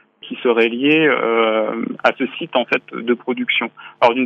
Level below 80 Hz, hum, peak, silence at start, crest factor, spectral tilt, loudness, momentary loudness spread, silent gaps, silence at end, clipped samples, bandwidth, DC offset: -80 dBFS; none; 0 dBFS; 0.25 s; 16 dB; -6 dB/octave; -17 LUFS; 8 LU; none; 0 s; under 0.1%; 7 kHz; under 0.1%